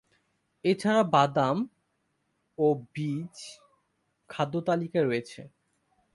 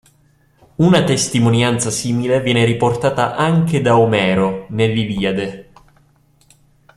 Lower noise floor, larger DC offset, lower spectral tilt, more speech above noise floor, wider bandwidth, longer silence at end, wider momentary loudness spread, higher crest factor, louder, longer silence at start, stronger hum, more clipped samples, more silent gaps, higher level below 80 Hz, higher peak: first, -76 dBFS vs -55 dBFS; neither; about the same, -6.5 dB/octave vs -5.5 dB/octave; first, 49 dB vs 40 dB; second, 11.5 kHz vs 13 kHz; second, 0.65 s vs 1.35 s; first, 21 LU vs 6 LU; first, 22 dB vs 16 dB; second, -28 LUFS vs -16 LUFS; second, 0.65 s vs 0.8 s; neither; neither; neither; second, -70 dBFS vs -48 dBFS; second, -8 dBFS vs 0 dBFS